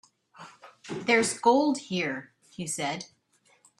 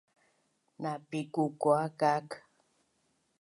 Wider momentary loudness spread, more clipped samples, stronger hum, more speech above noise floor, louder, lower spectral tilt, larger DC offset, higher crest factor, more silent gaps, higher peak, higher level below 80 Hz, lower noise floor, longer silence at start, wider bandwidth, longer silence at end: first, 25 LU vs 14 LU; neither; neither; second, 40 dB vs 44 dB; first, -27 LUFS vs -32 LUFS; second, -3.5 dB/octave vs -6.5 dB/octave; neither; about the same, 22 dB vs 20 dB; neither; first, -8 dBFS vs -14 dBFS; first, -72 dBFS vs -84 dBFS; second, -66 dBFS vs -75 dBFS; second, 0.4 s vs 0.8 s; first, 13 kHz vs 11.5 kHz; second, 0.75 s vs 1 s